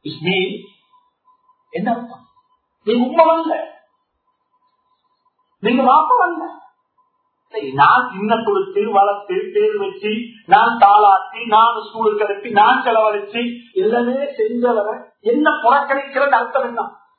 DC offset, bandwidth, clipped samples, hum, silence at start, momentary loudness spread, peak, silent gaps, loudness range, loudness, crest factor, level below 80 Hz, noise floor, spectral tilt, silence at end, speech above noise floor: under 0.1%; 4.5 kHz; under 0.1%; none; 0.05 s; 13 LU; 0 dBFS; none; 6 LU; -16 LUFS; 18 dB; -68 dBFS; -68 dBFS; -8.5 dB/octave; 0.3 s; 53 dB